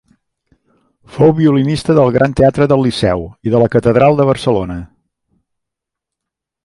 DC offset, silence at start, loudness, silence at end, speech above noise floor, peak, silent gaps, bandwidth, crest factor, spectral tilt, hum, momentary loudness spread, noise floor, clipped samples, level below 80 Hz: under 0.1%; 1.15 s; -12 LUFS; 1.8 s; 69 dB; 0 dBFS; none; 11.5 kHz; 14 dB; -7.5 dB/octave; none; 8 LU; -81 dBFS; under 0.1%; -38 dBFS